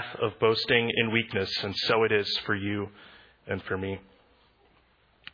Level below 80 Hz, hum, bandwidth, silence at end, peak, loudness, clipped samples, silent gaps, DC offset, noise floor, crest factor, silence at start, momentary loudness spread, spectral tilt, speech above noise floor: -64 dBFS; none; 5.2 kHz; 1.35 s; -6 dBFS; -27 LUFS; under 0.1%; none; under 0.1%; -64 dBFS; 22 dB; 0 s; 12 LU; -5.5 dB/octave; 36 dB